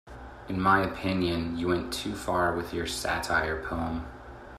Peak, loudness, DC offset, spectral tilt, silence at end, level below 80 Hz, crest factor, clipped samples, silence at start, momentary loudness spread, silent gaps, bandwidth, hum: -10 dBFS; -29 LUFS; under 0.1%; -5 dB/octave; 0 s; -46 dBFS; 20 dB; under 0.1%; 0.05 s; 13 LU; none; 15 kHz; none